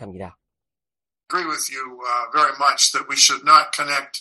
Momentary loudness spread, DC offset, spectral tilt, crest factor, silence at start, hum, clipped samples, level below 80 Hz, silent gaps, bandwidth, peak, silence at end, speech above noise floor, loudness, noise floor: 13 LU; under 0.1%; 0.5 dB/octave; 20 dB; 0 s; none; under 0.1%; -68 dBFS; none; 12.5 kHz; 0 dBFS; 0 s; over 71 dB; -17 LUFS; under -90 dBFS